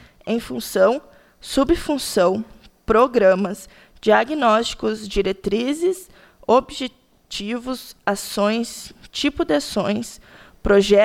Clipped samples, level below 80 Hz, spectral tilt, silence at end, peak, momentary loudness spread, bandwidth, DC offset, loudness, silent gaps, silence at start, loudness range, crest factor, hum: under 0.1%; -42 dBFS; -4.5 dB/octave; 0 s; -4 dBFS; 14 LU; 16.5 kHz; under 0.1%; -20 LUFS; none; 0.25 s; 5 LU; 16 dB; none